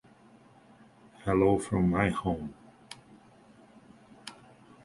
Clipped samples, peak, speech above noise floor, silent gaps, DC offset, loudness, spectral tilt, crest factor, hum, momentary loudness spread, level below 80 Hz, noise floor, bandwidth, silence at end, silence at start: under 0.1%; -10 dBFS; 31 dB; none; under 0.1%; -28 LUFS; -7 dB/octave; 22 dB; none; 23 LU; -52 dBFS; -58 dBFS; 11.5 kHz; 0.55 s; 1.25 s